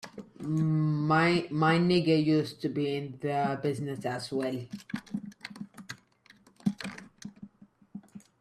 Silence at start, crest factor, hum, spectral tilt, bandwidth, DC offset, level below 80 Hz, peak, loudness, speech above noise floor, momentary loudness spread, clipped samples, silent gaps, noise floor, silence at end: 0.05 s; 18 dB; none; -7 dB/octave; 12.5 kHz; under 0.1%; -68 dBFS; -12 dBFS; -29 LUFS; 33 dB; 22 LU; under 0.1%; none; -61 dBFS; 0.2 s